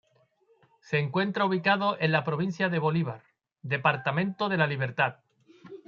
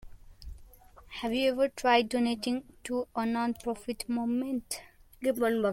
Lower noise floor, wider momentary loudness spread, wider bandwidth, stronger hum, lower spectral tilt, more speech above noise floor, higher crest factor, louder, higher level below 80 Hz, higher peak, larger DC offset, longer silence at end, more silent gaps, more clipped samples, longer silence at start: first, -66 dBFS vs -54 dBFS; second, 6 LU vs 14 LU; second, 7 kHz vs 16.5 kHz; neither; first, -7.5 dB/octave vs -4 dB/octave; first, 39 dB vs 24 dB; about the same, 20 dB vs 22 dB; first, -27 LUFS vs -31 LUFS; second, -72 dBFS vs -54 dBFS; about the same, -8 dBFS vs -10 dBFS; neither; about the same, 0.1 s vs 0 s; neither; neither; first, 0.85 s vs 0 s